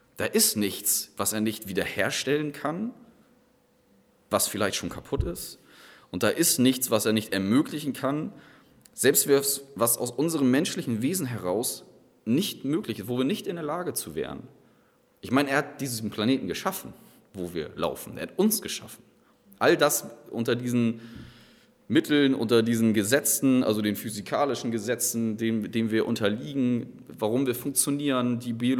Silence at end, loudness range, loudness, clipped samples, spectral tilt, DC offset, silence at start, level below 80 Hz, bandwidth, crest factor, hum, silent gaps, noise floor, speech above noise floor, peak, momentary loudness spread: 0 s; 6 LU; -26 LUFS; under 0.1%; -4 dB/octave; under 0.1%; 0.15 s; -52 dBFS; over 20 kHz; 20 dB; none; none; -64 dBFS; 37 dB; -8 dBFS; 13 LU